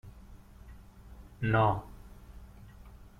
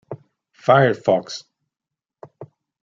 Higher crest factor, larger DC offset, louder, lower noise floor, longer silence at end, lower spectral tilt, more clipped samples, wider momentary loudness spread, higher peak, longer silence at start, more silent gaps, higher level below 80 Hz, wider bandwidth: about the same, 20 dB vs 20 dB; neither; second, -30 LUFS vs -18 LUFS; second, -52 dBFS vs -87 dBFS; second, 0.15 s vs 0.4 s; first, -8 dB/octave vs -6 dB/octave; neither; first, 27 LU vs 22 LU; second, -16 dBFS vs -2 dBFS; about the same, 0.05 s vs 0.1 s; neither; first, -50 dBFS vs -68 dBFS; first, 13 kHz vs 7.6 kHz